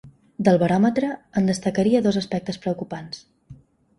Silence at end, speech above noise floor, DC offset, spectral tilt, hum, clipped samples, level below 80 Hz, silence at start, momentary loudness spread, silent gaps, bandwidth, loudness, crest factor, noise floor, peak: 0.45 s; 27 dB; under 0.1%; -6.5 dB/octave; none; under 0.1%; -56 dBFS; 0.05 s; 15 LU; none; 11.5 kHz; -22 LUFS; 20 dB; -48 dBFS; -4 dBFS